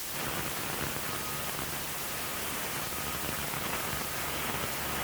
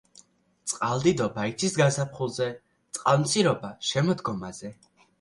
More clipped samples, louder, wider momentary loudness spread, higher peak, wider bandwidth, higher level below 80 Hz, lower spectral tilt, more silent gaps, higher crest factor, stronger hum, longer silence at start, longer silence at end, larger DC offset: neither; second, -32 LUFS vs -26 LUFS; second, 1 LU vs 15 LU; second, -16 dBFS vs -8 dBFS; first, over 20 kHz vs 11.5 kHz; first, -52 dBFS vs -62 dBFS; second, -2.5 dB/octave vs -4.5 dB/octave; neither; about the same, 18 dB vs 20 dB; neither; second, 0 s vs 0.65 s; second, 0 s vs 0.45 s; neither